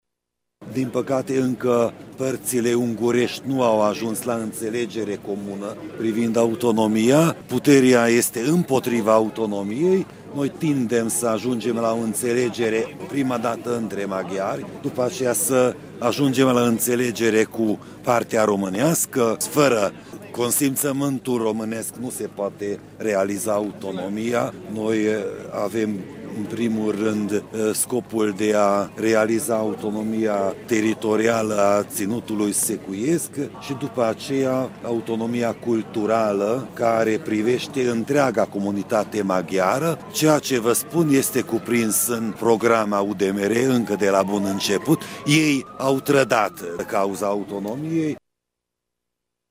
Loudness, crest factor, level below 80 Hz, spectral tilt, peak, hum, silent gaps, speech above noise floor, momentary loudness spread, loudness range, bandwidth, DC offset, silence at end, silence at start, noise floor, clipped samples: -22 LUFS; 18 dB; -62 dBFS; -4.5 dB/octave; -4 dBFS; none; none; 61 dB; 9 LU; 5 LU; 16 kHz; under 0.1%; 1.35 s; 0.6 s; -82 dBFS; under 0.1%